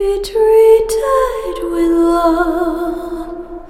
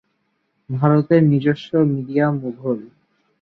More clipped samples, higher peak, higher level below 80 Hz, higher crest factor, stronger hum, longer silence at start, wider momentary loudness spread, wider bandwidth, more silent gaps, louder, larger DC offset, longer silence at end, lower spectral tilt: neither; about the same, 0 dBFS vs -2 dBFS; first, -34 dBFS vs -60 dBFS; about the same, 14 dB vs 16 dB; neither; second, 0 s vs 0.7 s; first, 14 LU vs 11 LU; first, 15.5 kHz vs 6 kHz; neither; first, -13 LUFS vs -19 LUFS; neither; second, 0 s vs 0.55 s; second, -4.5 dB/octave vs -10 dB/octave